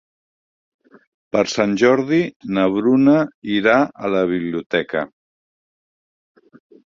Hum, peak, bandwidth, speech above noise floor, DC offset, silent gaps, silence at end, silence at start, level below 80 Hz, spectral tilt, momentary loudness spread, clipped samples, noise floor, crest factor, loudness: none; -2 dBFS; 7.6 kHz; over 73 dB; under 0.1%; 2.36-2.40 s, 3.34-3.42 s, 4.66-4.70 s; 1.8 s; 1.35 s; -60 dBFS; -6 dB/octave; 8 LU; under 0.1%; under -90 dBFS; 18 dB; -18 LUFS